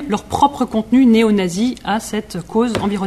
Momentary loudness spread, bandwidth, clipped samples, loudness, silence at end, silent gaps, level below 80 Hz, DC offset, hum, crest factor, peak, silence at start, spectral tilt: 10 LU; 13.5 kHz; under 0.1%; -16 LUFS; 0 s; none; -44 dBFS; under 0.1%; none; 14 dB; -2 dBFS; 0 s; -5.5 dB/octave